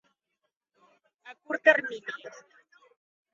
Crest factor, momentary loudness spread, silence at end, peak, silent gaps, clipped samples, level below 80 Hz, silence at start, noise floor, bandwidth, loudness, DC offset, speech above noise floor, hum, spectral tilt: 26 dB; 20 LU; 1.05 s; -6 dBFS; none; under 0.1%; -86 dBFS; 1.25 s; -82 dBFS; 7.4 kHz; -26 LUFS; under 0.1%; 55 dB; none; 0 dB/octave